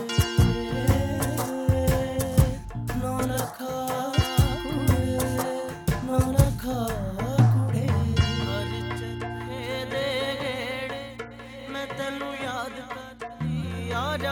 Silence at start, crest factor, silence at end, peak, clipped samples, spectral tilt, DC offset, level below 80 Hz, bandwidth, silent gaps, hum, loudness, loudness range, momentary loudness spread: 0 s; 20 dB; 0 s; -4 dBFS; under 0.1%; -6 dB/octave; under 0.1%; -36 dBFS; 19 kHz; none; none; -26 LUFS; 7 LU; 11 LU